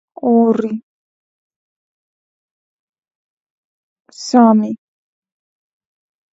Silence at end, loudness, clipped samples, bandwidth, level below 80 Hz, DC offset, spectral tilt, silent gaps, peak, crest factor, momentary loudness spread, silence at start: 1.6 s; -14 LUFS; under 0.1%; 7.8 kHz; -70 dBFS; under 0.1%; -6.5 dB/octave; 0.83-1.50 s, 1.56-3.02 s, 3.15-4.05 s; 0 dBFS; 20 dB; 18 LU; 0.25 s